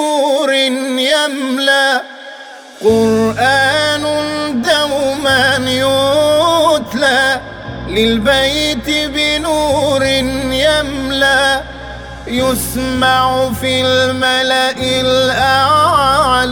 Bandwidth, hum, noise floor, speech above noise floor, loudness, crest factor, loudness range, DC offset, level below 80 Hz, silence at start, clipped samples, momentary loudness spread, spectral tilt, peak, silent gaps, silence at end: over 20 kHz; none; -33 dBFS; 20 dB; -12 LUFS; 14 dB; 2 LU; under 0.1%; -36 dBFS; 0 s; under 0.1%; 7 LU; -3.5 dB/octave; 0 dBFS; none; 0 s